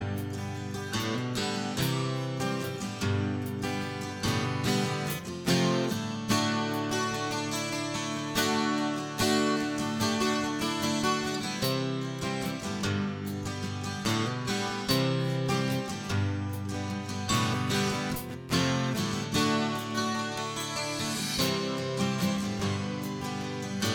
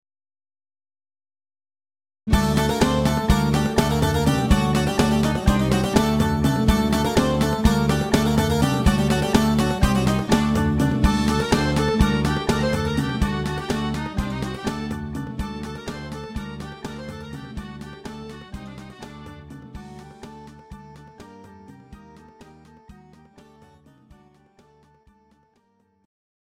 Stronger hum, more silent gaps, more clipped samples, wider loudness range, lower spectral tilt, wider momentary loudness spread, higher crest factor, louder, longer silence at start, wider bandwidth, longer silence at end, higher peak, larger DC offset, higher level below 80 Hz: neither; neither; neither; second, 3 LU vs 19 LU; second, -4.5 dB/octave vs -6 dB/octave; second, 7 LU vs 20 LU; about the same, 18 dB vs 20 dB; second, -30 LUFS vs -21 LUFS; second, 0 s vs 2.25 s; first, over 20 kHz vs 16.5 kHz; second, 0 s vs 3.55 s; second, -12 dBFS vs -2 dBFS; neither; second, -56 dBFS vs -32 dBFS